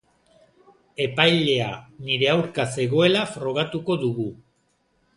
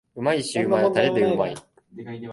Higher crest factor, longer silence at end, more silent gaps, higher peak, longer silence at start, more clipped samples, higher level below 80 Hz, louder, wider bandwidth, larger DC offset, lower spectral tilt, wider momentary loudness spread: about the same, 22 dB vs 18 dB; first, 0.8 s vs 0 s; neither; first, -2 dBFS vs -6 dBFS; first, 1 s vs 0.15 s; neither; about the same, -60 dBFS vs -62 dBFS; about the same, -22 LUFS vs -22 LUFS; about the same, 11.5 kHz vs 11.5 kHz; neither; about the same, -5 dB/octave vs -5.5 dB/octave; second, 12 LU vs 18 LU